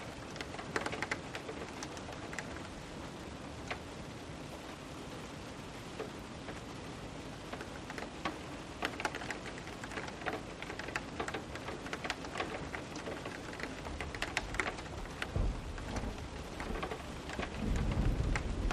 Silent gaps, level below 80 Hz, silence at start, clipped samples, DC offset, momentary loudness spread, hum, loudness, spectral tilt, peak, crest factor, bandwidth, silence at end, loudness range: none; -46 dBFS; 0 s; under 0.1%; under 0.1%; 9 LU; none; -41 LUFS; -4.5 dB/octave; -14 dBFS; 26 dB; 14 kHz; 0 s; 6 LU